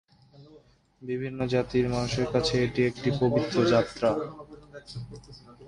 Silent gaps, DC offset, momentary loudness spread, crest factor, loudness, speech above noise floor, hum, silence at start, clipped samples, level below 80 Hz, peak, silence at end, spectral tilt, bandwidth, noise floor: none; under 0.1%; 20 LU; 18 dB; -27 LUFS; 30 dB; none; 0.4 s; under 0.1%; -50 dBFS; -10 dBFS; 0 s; -6 dB/octave; 11 kHz; -57 dBFS